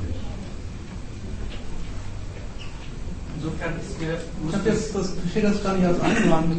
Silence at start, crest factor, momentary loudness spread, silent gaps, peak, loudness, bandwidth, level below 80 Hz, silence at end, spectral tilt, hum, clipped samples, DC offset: 0 s; 20 dB; 16 LU; none; -6 dBFS; -27 LUFS; 8.8 kHz; -34 dBFS; 0 s; -6 dB/octave; none; under 0.1%; under 0.1%